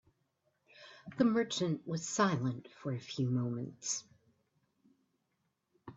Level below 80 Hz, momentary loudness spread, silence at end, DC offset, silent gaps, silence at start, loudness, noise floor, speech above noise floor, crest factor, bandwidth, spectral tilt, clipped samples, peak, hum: -76 dBFS; 12 LU; 0.05 s; under 0.1%; none; 0.8 s; -35 LUFS; -82 dBFS; 47 dB; 22 dB; 8.4 kHz; -5 dB/octave; under 0.1%; -16 dBFS; none